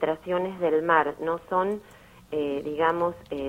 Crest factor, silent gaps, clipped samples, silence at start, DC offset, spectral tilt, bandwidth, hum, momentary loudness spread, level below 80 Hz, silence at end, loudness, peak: 20 dB; none; under 0.1%; 0 s; under 0.1%; -7 dB/octave; 16 kHz; none; 9 LU; -58 dBFS; 0 s; -26 LUFS; -6 dBFS